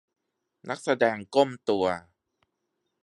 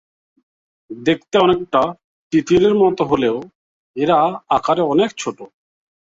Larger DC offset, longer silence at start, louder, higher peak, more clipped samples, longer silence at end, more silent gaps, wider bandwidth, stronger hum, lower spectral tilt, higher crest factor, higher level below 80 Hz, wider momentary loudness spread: neither; second, 0.65 s vs 0.9 s; second, -27 LUFS vs -17 LUFS; second, -8 dBFS vs -2 dBFS; neither; first, 1 s vs 0.55 s; second, none vs 2.04-2.31 s, 3.55-3.94 s; first, 11.5 kHz vs 7.8 kHz; neither; about the same, -5 dB/octave vs -5.5 dB/octave; first, 22 dB vs 16 dB; second, -66 dBFS vs -52 dBFS; about the same, 12 LU vs 13 LU